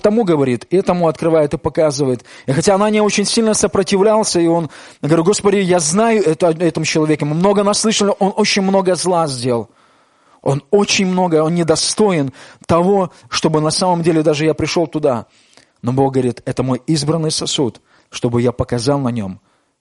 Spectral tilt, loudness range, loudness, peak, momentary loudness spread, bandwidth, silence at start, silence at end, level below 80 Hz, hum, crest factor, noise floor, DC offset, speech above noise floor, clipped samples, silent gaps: -5 dB/octave; 4 LU; -15 LUFS; -2 dBFS; 7 LU; 11.5 kHz; 0.05 s; 0.45 s; -48 dBFS; none; 14 dB; -53 dBFS; under 0.1%; 38 dB; under 0.1%; none